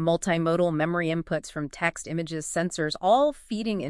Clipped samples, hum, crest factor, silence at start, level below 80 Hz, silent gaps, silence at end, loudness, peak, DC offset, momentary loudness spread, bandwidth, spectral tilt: under 0.1%; none; 16 dB; 0 s; -56 dBFS; none; 0 s; -26 LUFS; -8 dBFS; under 0.1%; 9 LU; 12 kHz; -5 dB/octave